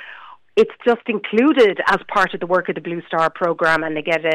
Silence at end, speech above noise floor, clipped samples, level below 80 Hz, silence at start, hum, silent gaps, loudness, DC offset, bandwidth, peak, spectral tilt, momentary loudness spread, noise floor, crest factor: 0 s; 23 dB; under 0.1%; -56 dBFS; 0 s; none; none; -18 LUFS; under 0.1%; 11.5 kHz; -6 dBFS; -5.5 dB/octave; 8 LU; -41 dBFS; 12 dB